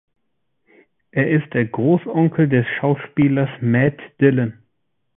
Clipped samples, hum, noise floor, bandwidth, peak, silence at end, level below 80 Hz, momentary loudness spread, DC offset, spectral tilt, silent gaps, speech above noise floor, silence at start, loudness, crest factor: under 0.1%; none; -75 dBFS; 3.8 kHz; -2 dBFS; 0.65 s; -54 dBFS; 5 LU; under 0.1%; -13 dB/octave; none; 57 dB; 1.15 s; -18 LUFS; 18 dB